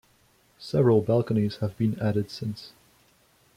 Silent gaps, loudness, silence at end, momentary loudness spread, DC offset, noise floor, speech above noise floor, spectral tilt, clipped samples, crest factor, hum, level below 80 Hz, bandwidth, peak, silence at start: none; -26 LUFS; 0.9 s; 18 LU; under 0.1%; -63 dBFS; 38 dB; -8.5 dB/octave; under 0.1%; 18 dB; none; -60 dBFS; 15 kHz; -10 dBFS; 0.6 s